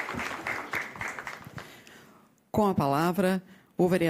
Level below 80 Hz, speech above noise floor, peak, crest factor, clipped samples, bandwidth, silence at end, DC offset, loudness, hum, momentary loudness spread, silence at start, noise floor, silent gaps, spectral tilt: -58 dBFS; 33 dB; -12 dBFS; 16 dB; under 0.1%; 16 kHz; 0 s; under 0.1%; -29 LUFS; none; 18 LU; 0 s; -58 dBFS; none; -6 dB/octave